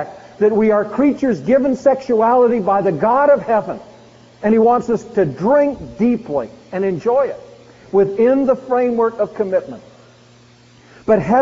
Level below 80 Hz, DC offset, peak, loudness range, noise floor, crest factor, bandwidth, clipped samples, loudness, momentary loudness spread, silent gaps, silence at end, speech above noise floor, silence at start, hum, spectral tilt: -50 dBFS; under 0.1%; -2 dBFS; 3 LU; -47 dBFS; 14 dB; 7.6 kHz; under 0.1%; -16 LUFS; 10 LU; none; 0 s; 32 dB; 0 s; none; -7 dB/octave